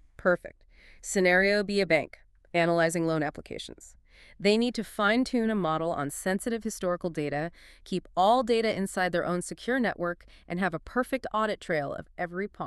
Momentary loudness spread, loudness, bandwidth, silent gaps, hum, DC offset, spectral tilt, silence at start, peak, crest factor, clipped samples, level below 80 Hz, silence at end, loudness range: 12 LU; -28 LUFS; 13.5 kHz; none; none; under 0.1%; -5 dB/octave; 0.2 s; -10 dBFS; 20 dB; under 0.1%; -56 dBFS; 0 s; 3 LU